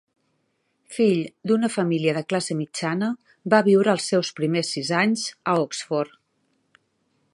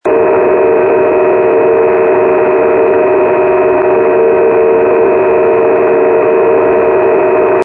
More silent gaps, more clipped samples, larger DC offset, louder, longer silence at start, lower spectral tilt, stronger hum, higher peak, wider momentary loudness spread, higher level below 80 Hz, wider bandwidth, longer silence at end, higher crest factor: neither; neither; neither; second, -23 LUFS vs -9 LUFS; first, 0.9 s vs 0.05 s; second, -5 dB/octave vs -9 dB/octave; neither; about the same, -2 dBFS vs 0 dBFS; first, 9 LU vs 1 LU; second, -72 dBFS vs -44 dBFS; first, 11.5 kHz vs 3.5 kHz; first, 1.25 s vs 0 s; first, 22 dB vs 8 dB